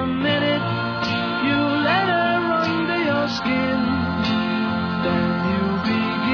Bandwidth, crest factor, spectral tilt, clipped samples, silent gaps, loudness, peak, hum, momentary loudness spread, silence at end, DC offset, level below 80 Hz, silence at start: 5.4 kHz; 14 dB; -6.5 dB/octave; under 0.1%; none; -21 LUFS; -8 dBFS; none; 4 LU; 0 s; under 0.1%; -48 dBFS; 0 s